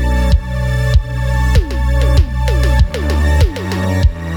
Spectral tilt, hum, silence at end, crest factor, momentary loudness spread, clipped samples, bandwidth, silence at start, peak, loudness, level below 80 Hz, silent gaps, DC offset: -6.5 dB/octave; none; 0 s; 12 dB; 4 LU; under 0.1%; 14 kHz; 0 s; 0 dBFS; -15 LUFS; -14 dBFS; none; under 0.1%